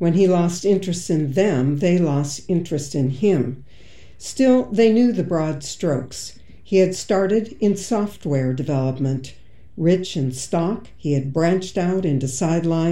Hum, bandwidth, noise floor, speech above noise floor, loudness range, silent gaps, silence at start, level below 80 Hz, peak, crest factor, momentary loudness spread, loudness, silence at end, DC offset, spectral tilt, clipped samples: none; 12.5 kHz; -47 dBFS; 28 dB; 3 LU; none; 0 s; -50 dBFS; -4 dBFS; 16 dB; 9 LU; -20 LUFS; 0 s; 1%; -6.5 dB/octave; under 0.1%